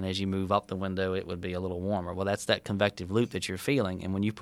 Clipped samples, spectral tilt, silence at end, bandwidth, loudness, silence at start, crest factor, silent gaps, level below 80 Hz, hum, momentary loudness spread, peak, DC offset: under 0.1%; -5.5 dB/octave; 0 s; 15 kHz; -30 LUFS; 0 s; 22 dB; none; -58 dBFS; none; 6 LU; -8 dBFS; under 0.1%